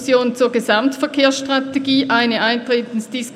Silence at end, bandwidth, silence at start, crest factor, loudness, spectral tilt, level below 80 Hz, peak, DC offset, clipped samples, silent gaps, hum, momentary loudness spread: 0 s; 14.5 kHz; 0 s; 16 dB; -17 LUFS; -3.5 dB/octave; -66 dBFS; -2 dBFS; under 0.1%; under 0.1%; none; none; 5 LU